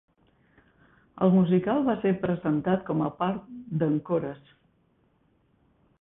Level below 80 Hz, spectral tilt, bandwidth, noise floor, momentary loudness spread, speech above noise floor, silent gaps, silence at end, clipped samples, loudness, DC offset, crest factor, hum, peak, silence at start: -62 dBFS; -12.5 dB/octave; 3.8 kHz; -67 dBFS; 11 LU; 42 dB; none; 1.65 s; under 0.1%; -26 LUFS; under 0.1%; 18 dB; none; -8 dBFS; 1.15 s